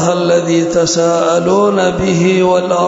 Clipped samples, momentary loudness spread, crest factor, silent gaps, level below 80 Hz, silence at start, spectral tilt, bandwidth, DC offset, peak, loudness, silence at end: under 0.1%; 2 LU; 10 dB; none; -40 dBFS; 0 s; -5 dB/octave; 8 kHz; under 0.1%; -2 dBFS; -12 LUFS; 0 s